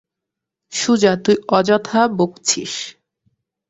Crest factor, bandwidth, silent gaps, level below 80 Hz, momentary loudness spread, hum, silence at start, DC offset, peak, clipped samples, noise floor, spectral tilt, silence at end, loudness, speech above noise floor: 18 dB; 8.2 kHz; none; -60 dBFS; 12 LU; none; 0.7 s; under 0.1%; -2 dBFS; under 0.1%; -83 dBFS; -3.5 dB/octave; 0.8 s; -17 LUFS; 66 dB